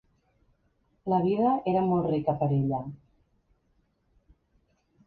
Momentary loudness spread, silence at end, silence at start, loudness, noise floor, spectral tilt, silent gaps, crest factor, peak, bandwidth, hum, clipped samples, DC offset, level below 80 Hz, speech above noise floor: 9 LU; 2.1 s; 1.05 s; -27 LUFS; -71 dBFS; -11.5 dB/octave; none; 18 dB; -12 dBFS; 4.7 kHz; none; under 0.1%; under 0.1%; -60 dBFS; 45 dB